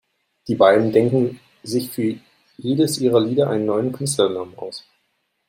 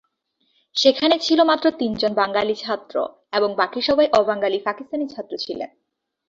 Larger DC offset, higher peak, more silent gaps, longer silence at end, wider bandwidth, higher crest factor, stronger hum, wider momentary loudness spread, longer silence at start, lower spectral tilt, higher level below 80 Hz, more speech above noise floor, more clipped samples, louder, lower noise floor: neither; about the same, -2 dBFS vs -2 dBFS; neither; about the same, 0.7 s vs 0.6 s; first, 16 kHz vs 7.6 kHz; about the same, 18 dB vs 20 dB; neither; first, 18 LU vs 12 LU; second, 0.45 s vs 0.75 s; first, -5.5 dB/octave vs -4 dB/octave; about the same, -62 dBFS vs -60 dBFS; about the same, 51 dB vs 49 dB; neither; about the same, -19 LUFS vs -20 LUFS; about the same, -70 dBFS vs -69 dBFS